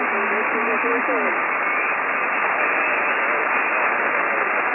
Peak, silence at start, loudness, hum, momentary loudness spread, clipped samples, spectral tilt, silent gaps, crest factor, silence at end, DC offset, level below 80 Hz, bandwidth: -8 dBFS; 0 s; -19 LUFS; none; 1 LU; under 0.1%; -6.5 dB/octave; none; 14 dB; 0 s; under 0.1%; -74 dBFS; 3.2 kHz